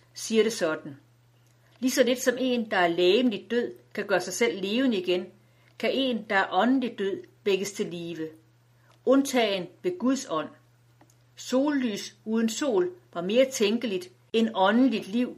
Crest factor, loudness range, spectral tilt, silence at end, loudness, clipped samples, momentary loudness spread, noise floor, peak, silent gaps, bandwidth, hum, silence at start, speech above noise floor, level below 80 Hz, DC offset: 20 dB; 3 LU; -4 dB/octave; 0 s; -26 LUFS; under 0.1%; 12 LU; -61 dBFS; -6 dBFS; none; 15 kHz; none; 0.15 s; 35 dB; -76 dBFS; under 0.1%